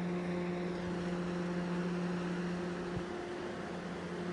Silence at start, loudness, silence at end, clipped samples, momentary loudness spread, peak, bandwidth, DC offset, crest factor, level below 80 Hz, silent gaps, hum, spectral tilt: 0 s; -38 LUFS; 0 s; under 0.1%; 5 LU; -26 dBFS; 10.5 kHz; under 0.1%; 12 dB; -62 dBFS; none; none; -7 dB/octave